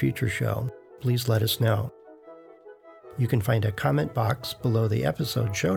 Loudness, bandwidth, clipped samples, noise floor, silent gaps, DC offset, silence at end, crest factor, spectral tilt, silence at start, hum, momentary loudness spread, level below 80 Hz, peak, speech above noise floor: -26 LUFS; 18.5 kHz; under 0.1%; -49 dBFS; none; under 0.1%; 0 s; 18 dB; -6 dB/octave; 0 s; none; 7 LU; -54 dBFS; -8 dBFS; 24 dB